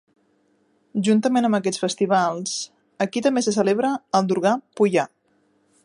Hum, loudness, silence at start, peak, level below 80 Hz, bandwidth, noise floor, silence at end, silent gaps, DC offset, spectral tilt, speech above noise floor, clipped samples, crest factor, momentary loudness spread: none; -21 LUFS; 0.95 s; -4 dBFS; -72 dBFS; 11.5 kHz; -64 dBFS; 0.8 s; none; under 0.1%; -5 dB/octave; 44 dB; under 0.1%; 18 dB; 8 LU